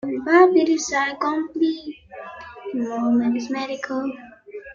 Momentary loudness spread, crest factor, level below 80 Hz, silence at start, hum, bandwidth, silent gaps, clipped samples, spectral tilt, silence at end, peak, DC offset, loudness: 22 LU; 18 dB; -62 dBFS; 0.05 s; none; 7.6 kHz; none; under 0.1%; -4 dB/octave; 0 s; -4 dBFS; under 0.1%; -21 LUFS